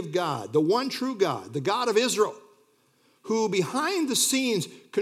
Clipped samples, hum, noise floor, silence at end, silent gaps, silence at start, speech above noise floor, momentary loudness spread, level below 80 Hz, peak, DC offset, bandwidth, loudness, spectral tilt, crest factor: under 0.1%; none; -65 dBFS; 0 s; none; 0 s; 39 dB; 7 LU; -84 dBFS; -10 dBFS; under 0.1%; 16.5 kHz; -25 LUFS; -3.5 dB/octave; 16 dB